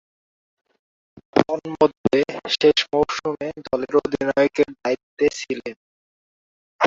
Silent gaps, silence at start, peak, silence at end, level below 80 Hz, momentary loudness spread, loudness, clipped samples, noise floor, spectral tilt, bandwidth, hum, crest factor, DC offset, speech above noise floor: 1.97-2.04 s, 5.03-5.17 s, 5.76-6.79 s; 1.35 s; -2 dBFS; 0 s; -56 dBFS; 10 LU; -21 LUFS; under 0.1%; under -90 dBFS; -4.5 dB/octave; 7.8 kHz; none; 20 dB; under 0.1%; over 69 dB